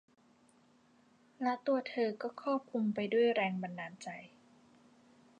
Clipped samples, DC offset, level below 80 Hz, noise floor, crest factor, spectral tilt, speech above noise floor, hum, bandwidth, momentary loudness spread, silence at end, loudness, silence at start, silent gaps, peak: under 0.1%; under 0.1%; -86 dBFS; -67 dBFS; 18 dB; -6.5 dB/octave; 33 dB; none; 9.8 kHz; 14 LU; 1.15 s; -35 LUFS; 1.4 s; none; -20 dBFS